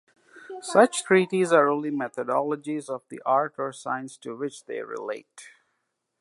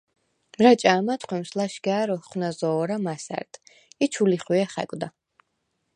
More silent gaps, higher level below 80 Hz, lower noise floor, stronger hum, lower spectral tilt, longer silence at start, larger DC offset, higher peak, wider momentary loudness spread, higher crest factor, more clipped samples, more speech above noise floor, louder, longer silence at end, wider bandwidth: neither; second, -80 dBFS vs -72 dBFS; about the same, -78 dBFS vs -76 dBFS; neither; about the same, -4.5 dB/octave vs -5.5 dB/octave; second, 0.35 s vs 0.6 s; neither; about the same, -4 dBFS vs -2 dBFS; about the same, 15 LU vs 15 LU; about the same, 22 dB vs 22 dB; neither; about the same, 53 dB vs 52 dB; about the same, -25 LUFS vs -24 LUFS; second, 0.7 s vs 0.85 s; about the same, 11.5 kHz vs 10.5 kHz